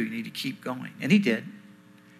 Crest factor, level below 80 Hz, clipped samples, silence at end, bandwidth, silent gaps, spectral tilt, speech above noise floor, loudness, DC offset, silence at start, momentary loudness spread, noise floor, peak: 20 dB; -80 dBFS; under 0.1%; 0.5 s; 14.5 kHz; none; -6 dB/octave; 26 dB; -27 LUFS; under 0.1%; 0 s; 13 LU; -53 dBFS; -10 dBFS